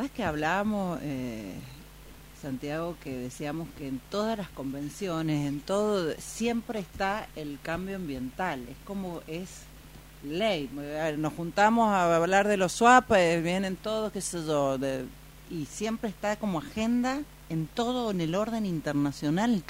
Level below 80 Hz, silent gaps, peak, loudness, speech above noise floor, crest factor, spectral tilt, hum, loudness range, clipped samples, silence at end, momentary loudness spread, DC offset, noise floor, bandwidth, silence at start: -52 dBFS; none; -8 dBFS; -29 LUFS; 20 dB; 22 dB; -5 dB/octave; none; 11 LU; under 0.1%; 0 s; 15 LU; under 0.1%; -49 dBFS; 16 kHz; 0 s